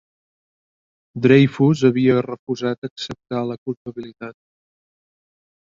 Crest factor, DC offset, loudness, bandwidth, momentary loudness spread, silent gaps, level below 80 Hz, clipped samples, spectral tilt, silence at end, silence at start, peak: 20 dB; under 0.1%; -19 LUFS; 7.6 kHz; 20 LU; 2.39-2.47 s, 2.78-2.82 s, 2.91-2.96 s, 3.58-3.66 s, 3.77-3.85 s; -58 dBFS; under 0.1%; -7.5 dB/octave; 1.45 s; 1.15 s; -2 dBFS